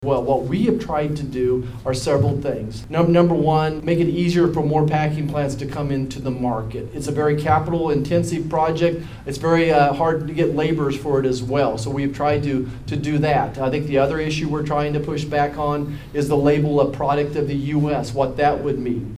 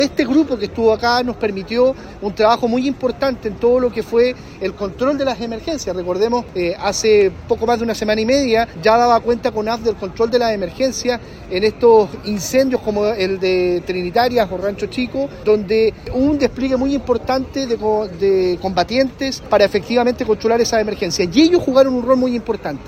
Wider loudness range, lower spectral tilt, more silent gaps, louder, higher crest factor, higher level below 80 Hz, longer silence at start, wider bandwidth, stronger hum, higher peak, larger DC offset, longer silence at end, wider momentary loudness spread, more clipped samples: about the same, 3 LU vs 3 LU; first, -7 dB/octave vs -5 dB/octave; neither; second, -20 LUFS vs -17 LUFS; about the same, 16 dB vs 16 dB; about the same, -40 dBFS vs -40 dBFS; about the same, 0 s vs 0 s; second, 13.5 kHz vs 15.5 kHz; neither; about the same, -2 dBFS vs 0 dBFS; neither; about the same, 0.05 s vs 0 s; about the same, 8 LU vs 8 LU; neither